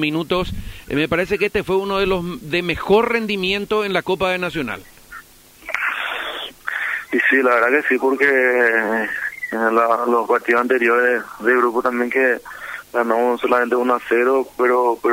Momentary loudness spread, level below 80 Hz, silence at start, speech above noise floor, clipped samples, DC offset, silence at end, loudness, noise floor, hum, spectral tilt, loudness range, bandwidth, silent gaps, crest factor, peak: 10 LU; -44 dBFS; 0 s; 26 dB; under 0.1%; under 0.1%; 0 s; -18 LUFS; -44 dBFS; none; -5 dB/octave; 5 LU; 16 kHz; none; 14 dB; -4 dBFS